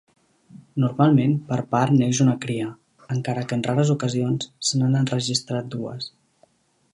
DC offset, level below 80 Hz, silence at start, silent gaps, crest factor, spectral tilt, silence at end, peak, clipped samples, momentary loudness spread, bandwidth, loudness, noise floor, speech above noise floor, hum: under 0.1%; -64 dBFS; 0.55 s; none; 20 dB; -5.5 dB/octave; 0.85 s; -4 dBFS; under 0.1%; 13 LU; 11.5 kHz; -22 LUFS; -61 dBFS; 40 dB; none